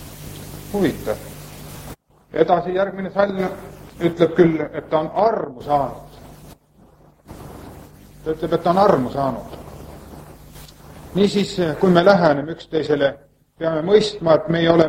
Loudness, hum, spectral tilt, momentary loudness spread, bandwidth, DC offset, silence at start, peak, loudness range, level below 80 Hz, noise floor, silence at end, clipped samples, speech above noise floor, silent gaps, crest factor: -19 LUFS; none; -6.5 dB/octave; 23 LU; 16.5 kHz; under 0.1%; 0 s; 0 dBFS; 6 LU; -46 dBFS; -51 dBFS; 0 s; under 0.1%; 34 dB; none; 20 dB